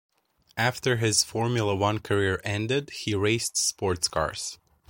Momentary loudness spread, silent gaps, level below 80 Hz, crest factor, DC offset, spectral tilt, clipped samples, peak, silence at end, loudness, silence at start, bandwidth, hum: 7 LU; none; -54 dBFS; 20 dB; under 0.1%; -3.5 dB/octave; under 0.1%; -8 dBFS; 0.35 s; -26 LUFS; 0.55 s; 17 kHz; none